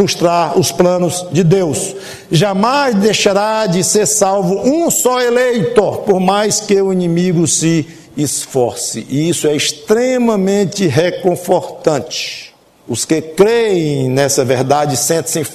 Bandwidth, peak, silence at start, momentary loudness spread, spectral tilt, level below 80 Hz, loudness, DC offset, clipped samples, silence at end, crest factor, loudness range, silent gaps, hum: 14 kHz; 0 dBFS; 0 s; 6 LU; -4.5 dB/octave; -50 dBFS; -13 LUFS; under 0.1%; under 0.1%; 0 s; 14 dB; 3 LU; none; none